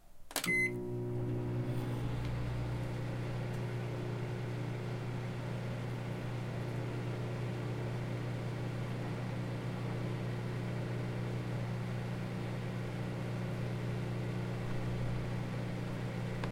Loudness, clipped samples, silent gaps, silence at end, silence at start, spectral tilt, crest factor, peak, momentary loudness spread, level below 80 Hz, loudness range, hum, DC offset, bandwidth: -38 LUFS; under 0.1%; none; 0 s; 0 s; -6.5 dB/octave; 18 dB; -18 dBFS; 3 LU; -52 dBFS; 1 LU; 60 Hz at -40 dBFS; under 0.1%; 16.5 kHz